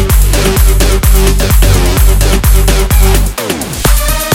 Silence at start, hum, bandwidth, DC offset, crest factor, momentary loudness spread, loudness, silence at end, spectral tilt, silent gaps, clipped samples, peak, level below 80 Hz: 0 s; none; 17 kHz; under 0.1%; 8 dB; 3 LU; -10 LUFS; 0 s; -4.5 dB/octave; none; 0.4%; 0 dBFS; -8 dBFS